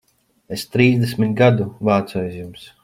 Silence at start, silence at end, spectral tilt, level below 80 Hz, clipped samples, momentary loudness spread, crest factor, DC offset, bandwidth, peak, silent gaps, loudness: 0.5 s; 0.2 s; -7 dB/octave; -54 dBFS; under 0.1%; 15 LU; 16 dB; under 0.1%; 16 kHz; -2 dBFS; none; -18 LUFS